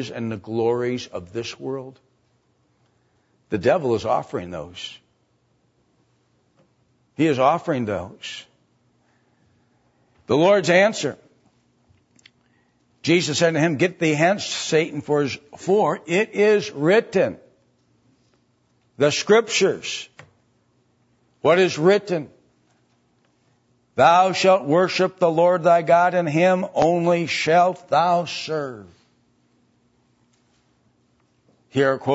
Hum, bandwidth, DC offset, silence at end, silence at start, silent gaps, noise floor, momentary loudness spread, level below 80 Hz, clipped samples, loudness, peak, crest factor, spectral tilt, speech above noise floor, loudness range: none; 8 kHz; under 0.1%; 0 s; 0 s; none; -65 dBFS; 15 LU; -64 dBFS; under 0.1%; -20 LUFS; -2 dBFS; 20 dB; -5 dB/octave; 46 dB; 9 LU